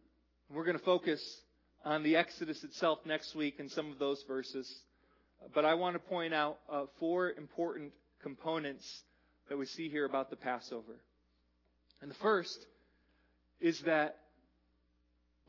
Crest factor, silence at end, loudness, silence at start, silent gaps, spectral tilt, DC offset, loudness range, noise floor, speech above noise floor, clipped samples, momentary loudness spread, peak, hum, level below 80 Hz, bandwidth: 22 dB; 1.35 s; -37 LUFS; 0.5 s; none; -3 dB/octave; under 0.1%; 5 LU; -75 dBFS; 39 dB; under 0.1%; 16 LU; -16 dBFS; none; -78 dBFS; 6 kHz